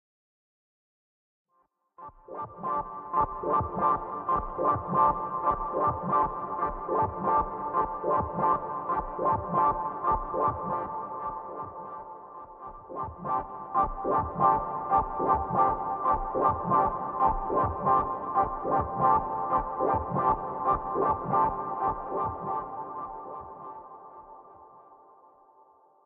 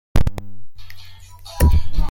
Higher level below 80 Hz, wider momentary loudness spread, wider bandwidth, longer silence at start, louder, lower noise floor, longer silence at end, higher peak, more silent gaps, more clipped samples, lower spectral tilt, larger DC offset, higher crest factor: second, -48 dBFS vs -22 dBFS; second, 16 LU vs 25 LU; second, 3.7 kHz vs 17 kHz; first, 2 s vs 0.15 s; second, -28 LUFS vs -20 LUFS; first, -72 dBFS vs -38 dBFS; first, 1.1 s vs 0 s; second, -10 dBFS vs -2 dBFS; neither; neither; first, -8 dB/octave vs -6 dB/octave; neither; first, 20 dB vs 14 dB